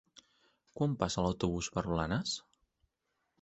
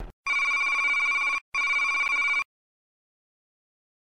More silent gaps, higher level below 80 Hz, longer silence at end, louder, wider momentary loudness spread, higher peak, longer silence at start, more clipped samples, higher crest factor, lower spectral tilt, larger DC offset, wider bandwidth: second, none vs 0.13-0.24 s, 1.41-1.52 s; about the same, -54 dBFS vs -56 dBFS; second, 1 s vs 1.55 s; second, -35 LUFS vs -23 LUFS; about the same, 6 LU vs 5 LU; about the same, -14 dBFS vs -16 dBFS; first, 0.75 s vs 0 s; neither; first, 22 dB vs 10 dB; first, -5 dB/octave vs 0.5 dB/octave; second, under 0.1% vs 0.3%; second, 8.2 kHz vs 15 kHz